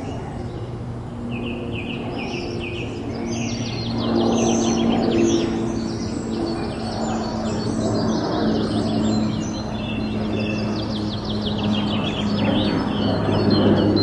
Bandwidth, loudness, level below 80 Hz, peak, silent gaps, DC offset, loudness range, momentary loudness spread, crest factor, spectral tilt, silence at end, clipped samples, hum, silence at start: 10.5 kHz; -23 LUFS; -40 dBFS; -4 dBFS; none; under 0.1%; 5 LU; 9 LU; 18 dB; -6 dB/octave; 0 s; under 0.1%; none; 0 s